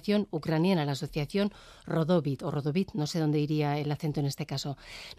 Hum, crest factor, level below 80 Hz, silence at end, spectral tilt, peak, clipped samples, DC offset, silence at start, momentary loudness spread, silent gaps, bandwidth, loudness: none; 14 dB; -58 dBFS; 0.05 s; -6.5 dB/octave; -16 dBFS; under 0.1%; under 0.1%; 0.05 s; 7 LU; none; 14.5 kHz; -30 LUFS